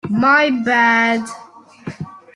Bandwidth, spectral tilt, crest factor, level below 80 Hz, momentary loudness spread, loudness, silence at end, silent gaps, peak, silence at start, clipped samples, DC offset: 11.5 kHz; -5 dB/octave; 16 dB; -60 dBFS; 21 LU; -14 LUFS; 0.15 s; none; -2 dBFS; 0.05 s; under 0.1%; under 0.1%